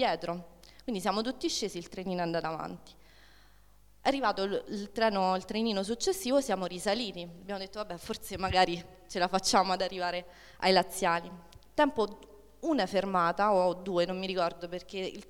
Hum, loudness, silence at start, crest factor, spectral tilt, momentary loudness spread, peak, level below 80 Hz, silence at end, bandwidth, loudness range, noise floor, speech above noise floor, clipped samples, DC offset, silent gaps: 50 Hz at -60 dBFS; -31 LUFS; 0 s; 22 dB; -4 dB/octave; 13 LU; -10 dBFS; -56 dBFS; 0.05 s; 19 kHz; 5 LU; -62 dBFS; 31 dB; under 0.1%; under 0.1%; none